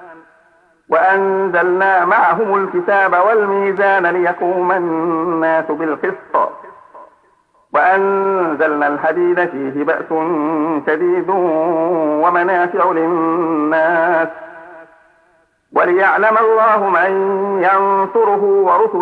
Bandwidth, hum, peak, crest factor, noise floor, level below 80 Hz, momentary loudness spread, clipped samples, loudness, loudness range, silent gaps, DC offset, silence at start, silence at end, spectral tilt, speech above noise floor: 4.9 kHz; none; -2 dBFS; 12 dB; -56 dBFS; -66 dBFS; 6 LU; under 0.1%; -14 LUFS; 4 LU; none; under 0.1%; 0 s; 0 s; -8 dB/octave; 42 dB